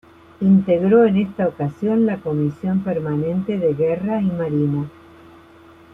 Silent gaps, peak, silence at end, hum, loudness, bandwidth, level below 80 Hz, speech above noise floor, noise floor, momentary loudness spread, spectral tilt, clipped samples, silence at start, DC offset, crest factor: none; -4 dBFS; 1.05 s; none; -19 LUFS; 3.8 kHz; -56 dBFS; 28 dB; -46 dBFS; 8 LU; -10.5 dB/octave; under 0.1%; 0.4 s; under 0.1%; 16 dB